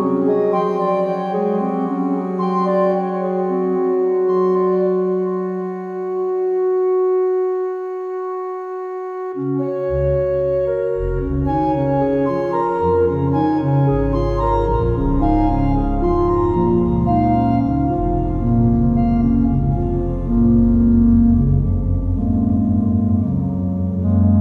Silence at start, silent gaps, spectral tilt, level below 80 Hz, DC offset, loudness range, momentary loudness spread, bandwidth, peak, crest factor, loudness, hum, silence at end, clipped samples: 0 s; none; -11 dB/octave; -28 dBFS; under 0.1%; 5 LU; 7 LU; 5.2 kHz; -4 dBFS; 14 dB; -18 LUFS; none; 0 s; under 0.1%